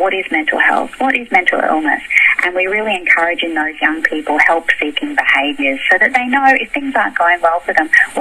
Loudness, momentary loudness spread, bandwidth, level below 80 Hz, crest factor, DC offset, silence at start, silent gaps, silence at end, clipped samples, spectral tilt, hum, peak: -13 LUFS; 5 LU; 14.5 kHz; -50 dBFS; 14 dB; under 0.1%; 0 s; none; 0 s; under 0.1%; -2.5 dB/octave; none; 0 dBFS